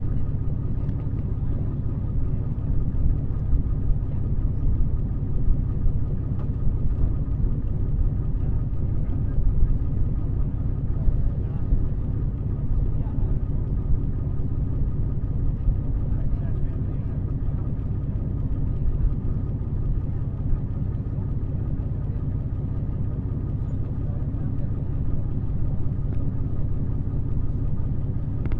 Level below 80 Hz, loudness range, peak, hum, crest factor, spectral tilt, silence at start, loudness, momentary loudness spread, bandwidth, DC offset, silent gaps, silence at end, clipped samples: -26 dBFS; 2 LU; -8 dBFS; none; 16 dB; -12.5 dB/octave; 0 s; -28 LUFS; 2 LU; 2.4 kHz; under 0.1%; none; 0 s; under 0.1%